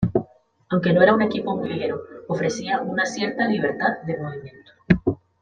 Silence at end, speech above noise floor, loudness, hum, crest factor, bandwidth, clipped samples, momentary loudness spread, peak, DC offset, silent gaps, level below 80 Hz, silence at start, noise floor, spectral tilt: 0.25 s; 21 dB; -22 LUFS; none; 20 dB; 9.2 kHz; under 0.1%; 13 LU; -2 dBFS; under 0.1%; none; -48 dBFS; 0 s; -43 dBFS; -6.5 dB/octave